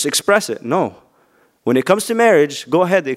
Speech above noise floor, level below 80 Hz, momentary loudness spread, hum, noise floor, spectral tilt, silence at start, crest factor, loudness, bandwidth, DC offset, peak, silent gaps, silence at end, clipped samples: 41 dB; -64 dBFS; 7 LU; none; -56 dBFS; -4 dB/octave; 0 s; 16 dB; -16 LUFS; 16 kHz; under 0.1%; 0 dBFS; none; 0 s; under 0.1%